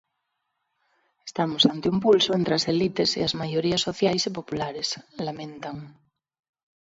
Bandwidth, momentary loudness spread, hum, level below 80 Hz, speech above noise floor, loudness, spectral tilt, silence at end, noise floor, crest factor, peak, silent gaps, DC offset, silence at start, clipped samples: 8 kHz; 15 LU; none; -60 dBFS; 54 dB; -24 LUFS; -4.5 dB/octave; 0.95 s; -79 dBFS; 22 dB; -4 dBFS; none; under 0.1%; 1.25 s; under 0.1%